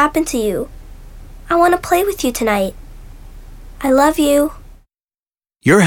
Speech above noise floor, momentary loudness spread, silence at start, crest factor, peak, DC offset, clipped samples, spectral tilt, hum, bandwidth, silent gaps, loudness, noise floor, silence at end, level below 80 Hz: over 75 dB; 10 LU; 0 s; 16 dB; -2 dBFS; under 0.1%; under 0.1%; -5 dB/octave; none; 19.5 kHz; 5.19-5.26 s; -16 LUFS; under -90 dBFS; 0 s; -36 dBFS